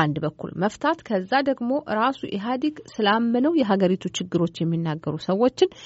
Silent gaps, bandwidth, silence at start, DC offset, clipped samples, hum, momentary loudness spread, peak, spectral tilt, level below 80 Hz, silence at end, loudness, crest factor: none; 8 kHz; 0 s; under 0.1%; under 0.1%; none; 7 LU; -6 dBFS; -5 dB/octave; -62 dBFS; 0 s; -24 LUFS; 18 dB